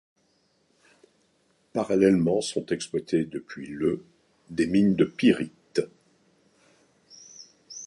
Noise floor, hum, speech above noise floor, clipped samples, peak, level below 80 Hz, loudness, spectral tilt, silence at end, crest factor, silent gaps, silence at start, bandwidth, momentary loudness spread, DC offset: -68 dBFS; none; 44 dB; under 0.1%; -6 dBFS; -60 dBFS; -26 LUFS; -6 dB/octave; 0 s; 20 dB; none; 1.75 s; 11.5 kHz; 21 LU; under 0.1%